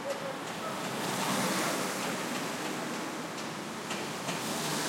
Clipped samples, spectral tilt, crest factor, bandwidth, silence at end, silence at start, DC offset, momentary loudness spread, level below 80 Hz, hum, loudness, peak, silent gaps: under 0.1%; -3 dB/octave; 16 dB; 16.5 kHz; 0 s; 0 s; under 0.1%; 7 LU; -76 dBFS; none; -34 LUFS; -18 dBFS; none